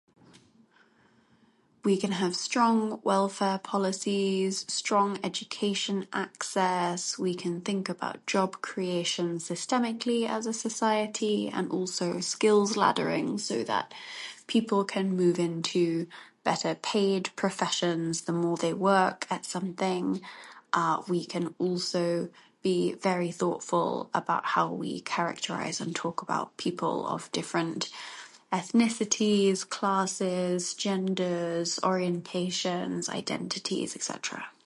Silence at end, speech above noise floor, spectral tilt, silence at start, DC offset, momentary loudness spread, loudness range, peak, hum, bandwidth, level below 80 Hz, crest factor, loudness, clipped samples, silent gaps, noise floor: 0.15 s; 36 dB; -4 dB/octave; 1.85 s; under 0.1%; 8 LU; 3 LU; -6 dBFS; none; 11.5 kHz; -76 dBFS; 22 dB; -29 LUFS; under 0.1%; none; -64 dBFS